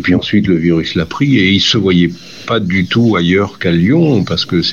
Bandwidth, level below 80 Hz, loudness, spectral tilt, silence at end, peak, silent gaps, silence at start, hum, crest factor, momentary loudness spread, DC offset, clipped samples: 7.4 kHz; -44 dBFS; -12 LUFS; -6 dB/octave; 0 s; 0 dBFS; none; 0 s; none; 10 dB; 6 LU; 0.6%; under 0.1%